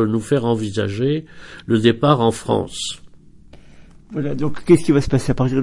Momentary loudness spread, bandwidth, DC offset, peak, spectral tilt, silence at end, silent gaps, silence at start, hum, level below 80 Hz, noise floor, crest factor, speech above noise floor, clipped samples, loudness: 12 LU; 11.5 kHz; under 0.1%; -2 dBFS; -6.5 dB/octave; 0 s; none; 0 s; none; -40 dBFS; -43 dBFS; 18 dB; 26 dB; under 0.1%; -19 LUFS